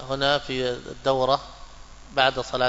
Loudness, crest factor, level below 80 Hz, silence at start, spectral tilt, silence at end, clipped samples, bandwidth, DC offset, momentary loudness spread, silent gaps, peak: -24 LUFS; 20 dB; -46 dBFS; 0 s; -4 dB/octave; 0 s; under 0.1%; 8 kHz; under 0.1%; 7 LU; none; -4 dBFS